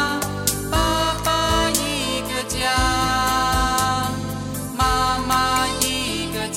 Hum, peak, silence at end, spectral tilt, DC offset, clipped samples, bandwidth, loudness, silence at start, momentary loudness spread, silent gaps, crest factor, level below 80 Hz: none; -4 dBFS; 0 s; -3 dB/octave; under 0.1%; under 0.1%; 17 kHz; -20 LUFS; 0 s; 6 LU; none; 16 dB; -32 dBFS